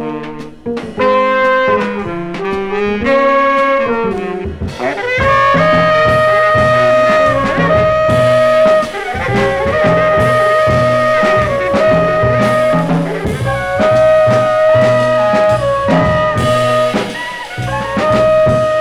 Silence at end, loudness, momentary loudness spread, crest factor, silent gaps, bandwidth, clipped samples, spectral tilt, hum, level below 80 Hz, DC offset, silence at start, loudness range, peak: 0 s; -12 LUFS; 10 LU; 12 dB; none; 13 kHz; under 0.1%; -6 dB/octave; none; -34 dBFS; under 0.1%; 0 s; 3 LU; 0 dBFS